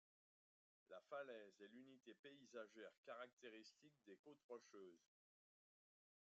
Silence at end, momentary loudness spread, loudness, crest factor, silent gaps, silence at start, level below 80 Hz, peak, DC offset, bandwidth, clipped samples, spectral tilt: 1.3 s; 11 LU; -62 LUFS; 20 dB; 2.19-2.23 s, 2.98-3.03 s, 3.33-3.37 s, 4.19-4.24 s, 4.44-4.49 s; 0.9 s; under -90 dBFS; -42 dBFS; under 0.1%; 7.4 kHz; under 0.1%; -2 dB/octave